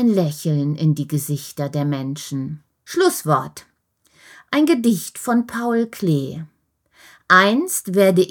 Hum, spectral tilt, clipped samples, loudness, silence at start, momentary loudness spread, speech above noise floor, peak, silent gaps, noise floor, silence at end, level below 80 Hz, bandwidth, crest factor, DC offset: none; -5.5 dB/octave; under 0.1%; -19 LUFS; 0 s; 13 LU; 43 dB; 0 dBFS; none; -61 dBFS; 0 s; -66 dBFS; 19.5 kHz; 20 dB; under 0.1%